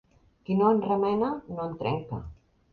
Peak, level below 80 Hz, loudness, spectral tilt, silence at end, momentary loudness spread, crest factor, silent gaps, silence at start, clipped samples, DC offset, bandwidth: -12 dBFS; -54 dBFS; -27 LUFS; -10 dB/octave; 0.4 s; 16 LU; 16 dB; none; 0.5 s; under 0.1%; under 0.1%; 5 kHz